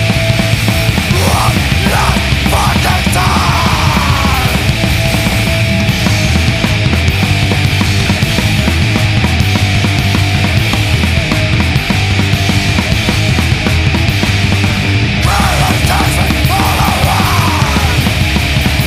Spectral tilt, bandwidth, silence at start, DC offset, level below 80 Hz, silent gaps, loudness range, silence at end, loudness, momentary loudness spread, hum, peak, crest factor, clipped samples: -4.5 dB/octave; 15.5 kHz; 0 s; under 0.1%; -20 dBFS; none; 1 LU; 0 s; -11 LUFS; 1 LU; none; 0 dBFS; 10 dB; under 0.1%